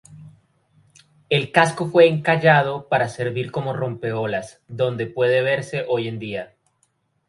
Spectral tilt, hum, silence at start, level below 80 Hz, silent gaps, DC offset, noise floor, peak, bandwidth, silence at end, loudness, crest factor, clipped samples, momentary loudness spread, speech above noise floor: -6 dB/octave; none; 0.1 s; -60 dBFS; none; under 0.1%; -67 dBFS; 0 dBFS; 11.5 kHz; 0.85 s; -20 LUFS; 22 dB; under 0.1%; 13 LU; 47 dB